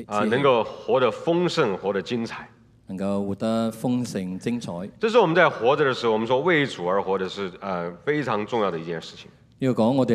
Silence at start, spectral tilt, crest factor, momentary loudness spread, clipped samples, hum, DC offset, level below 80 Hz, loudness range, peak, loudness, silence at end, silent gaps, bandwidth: 0 s; -6 dB/octave; 20 dB; 11 LU; under 0.1%; none; under 0.1%; -64 dBFS; 5 LU; -2 dBFS; -23 LUFS; 0 s; none; 13.5 kHz